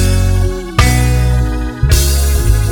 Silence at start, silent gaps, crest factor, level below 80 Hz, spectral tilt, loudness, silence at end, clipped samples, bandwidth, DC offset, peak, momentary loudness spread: 0 s; none; 10 dB; -14 dBFS; -5 dB/octave; -13 LUFS; 0 s; 0.1%; 19.5 kHz; under 0.1%; 0 dBFS; 5 LU